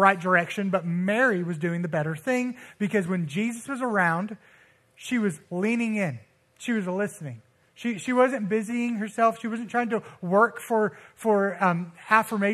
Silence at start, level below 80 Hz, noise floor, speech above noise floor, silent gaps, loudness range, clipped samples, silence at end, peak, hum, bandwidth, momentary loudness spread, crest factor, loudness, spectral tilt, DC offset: 0 s; -74 dBFS; -58 dBFS; 33 dB; none; 4 LU; under 0.1%; 0 s; -4 dBFS; none; 14 kHz; 9 LU; 22 dB; -26 LUFS; -6 dB/octave; under 0.1%